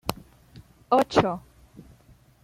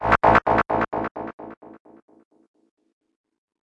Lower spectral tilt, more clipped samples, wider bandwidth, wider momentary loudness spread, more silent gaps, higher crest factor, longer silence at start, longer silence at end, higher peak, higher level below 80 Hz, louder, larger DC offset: second, -5.5 dB/octave vs -7 dB/octave; neither; first, 16 kHz vs 9 kHz; second, 18 LU vs 23 LU; second, none vs 1.11-1.15 s, 1.33-1.38 s; about the same, 26 dB vs 22 dB; about the same, 0.05 s vs 0 s; second, 1.05 s vs 2.15 s; about the same, -4 dBFS vs -4 dBFS; second, -52 dBFS vs -44 dBFS; second, -24 LUFS vs -20 LUFS; neither